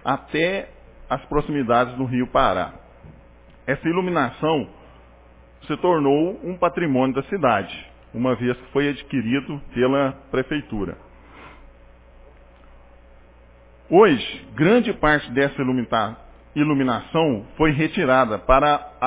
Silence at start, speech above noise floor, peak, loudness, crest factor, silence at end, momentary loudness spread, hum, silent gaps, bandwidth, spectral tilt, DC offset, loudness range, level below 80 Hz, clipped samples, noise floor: 0.05 s; 29 dB; -2 dBFS; -21 LUFS; 20 dB; 0 s; 12 LU; none; none; 4 kHz; -10.5 dB/octave; under 0.1%; 7 LU; -42 dBFS; under 0.1%; -49 dBFS